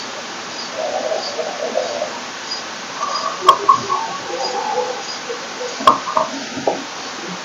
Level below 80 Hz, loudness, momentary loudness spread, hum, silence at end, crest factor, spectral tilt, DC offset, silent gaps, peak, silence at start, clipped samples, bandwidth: -66 dBFS; -20 LUFS; 12 LU; none; 0 s; 20 dB; -2 dB/octave; under 0.1%; none; 0 dBFS; 0 s; under 0.1%; 16 kHz